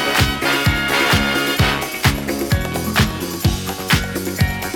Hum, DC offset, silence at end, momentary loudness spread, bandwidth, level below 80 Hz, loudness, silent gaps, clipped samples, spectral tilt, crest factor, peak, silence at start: none; under 0.1%; 0 s; 5 LU; over 20 kHz; -30 dBFS; -18 LUFS; none; under 0.1%; -4 dB/octave; 16 dB; 0 dBFS; 0 s